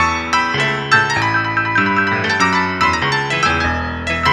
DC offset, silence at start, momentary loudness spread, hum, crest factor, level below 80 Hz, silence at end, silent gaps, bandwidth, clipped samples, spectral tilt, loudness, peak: under 0.1%; 0 s; 3 LU; none; 16 dB; -36 dBFS; 0 s; none; 13 kHz; under 0.1%; -4 dB/octave; -15 LUFS; 0 dBFS